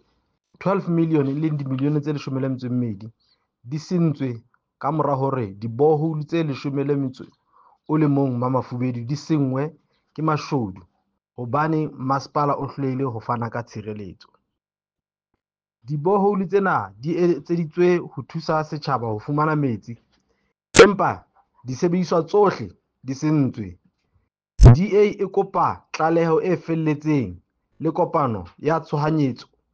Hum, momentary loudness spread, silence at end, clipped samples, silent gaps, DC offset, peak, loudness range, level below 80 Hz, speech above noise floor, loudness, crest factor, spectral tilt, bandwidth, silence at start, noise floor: none; 14 LU; 0.3 s; under 0.1%; none; under 0.1%; -2 dBFS; 7 LU; -34 dBFS; over 68 dB; -21 LUFS; 20 dB; -7 dB/octave; 9.6 kHz; 0.6 s; under -90 dBFS